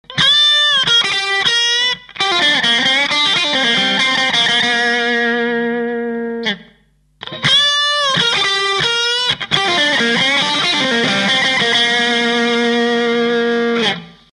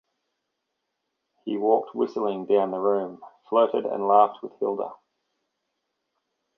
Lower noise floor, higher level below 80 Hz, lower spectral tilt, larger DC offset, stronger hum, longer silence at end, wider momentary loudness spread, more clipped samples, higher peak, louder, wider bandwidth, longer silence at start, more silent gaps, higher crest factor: second, -54 dBFS vs -80 dBFS; first, -54 dBFS vs -80 dBFS; second, -2 dB/octave vs -8 dB/octave; neither; neither; second, 0.25 s vs 1.6 s; second, 8 LU vs 12 LU; neither; first, -2 dBFS vs -6 dBFS; first, -13 LUFS vs -24 LUFS; first, 11.5 kHz vs 6 kHz; second, 0.1 s vs 1.45 s; neither; second, 14 dB vs 22 dB